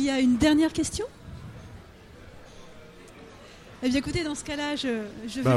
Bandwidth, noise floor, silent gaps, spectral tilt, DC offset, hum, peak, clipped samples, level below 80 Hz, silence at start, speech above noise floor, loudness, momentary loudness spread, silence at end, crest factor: 14 kHz; -48 dBFS; none; -5 dB/octave; under 0.1%; none; -10 dBFS; under 0.1%; -48 dBFS; 0 s; 23 dB; -26 LUFS; 27 LU; 0 s; 18 dB